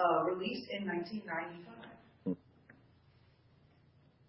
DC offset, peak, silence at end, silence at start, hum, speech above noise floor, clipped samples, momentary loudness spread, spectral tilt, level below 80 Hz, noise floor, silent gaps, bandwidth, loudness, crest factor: under 0.1%; -18 dBFS; 1.55 s; 0 s; none; 25 dB; under 0.1%; 19 LU; -4 dB/octave; -76 dBFS; -66 dBFS; none; 5.6 kHz; -38 LUFS; 20 dB